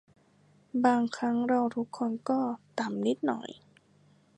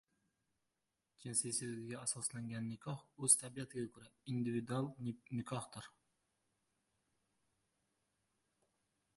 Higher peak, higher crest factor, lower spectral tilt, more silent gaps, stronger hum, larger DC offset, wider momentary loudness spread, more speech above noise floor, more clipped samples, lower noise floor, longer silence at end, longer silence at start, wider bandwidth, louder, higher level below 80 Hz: first, -10 dBFS vs -16 dBFS; second, 20 dB vs 30 dB; first, -6 dB/octave vs -4 dB/octave; neither; first, 50 Hz at -60 dBFS vs none; neither; second, 9 LU vs 18 LU; second, 34 dB vs 47 dB; neither; second, -63 dBFS vs -88 dBFS; second, 0.85 s vs 3.3 s; second, 0.75 s vs 1.2 s; second, 9.2 kHz vs 11.5 kHz; first, -30 LUFS vs -40 LUFS; about the same, -80 dBFS vs -78 dBFS